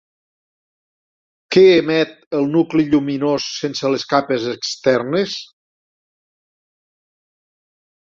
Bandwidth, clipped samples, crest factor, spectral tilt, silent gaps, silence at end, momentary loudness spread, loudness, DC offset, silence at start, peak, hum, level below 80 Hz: 7.6 kHz; under 0.1%; 18 dB; -5 dB/octave; 2.26-2.31 s; 2.75 s; 10 LU; -17 LUFS; under 0.1%; 1.5 s; -2 dBFS; none; -60 dBFS